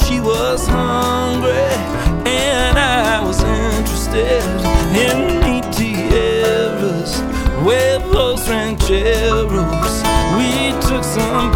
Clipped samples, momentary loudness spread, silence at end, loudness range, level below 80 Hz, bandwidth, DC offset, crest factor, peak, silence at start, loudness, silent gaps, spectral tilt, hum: under 0.1%; 4 LU; 0 s; 1 LU; -22 dBFS; 17.5 kHz; under 0.1%; 14 dB; 0 dBFS; 0 s; -16 LUFS; none; -4.5 dB/octave; none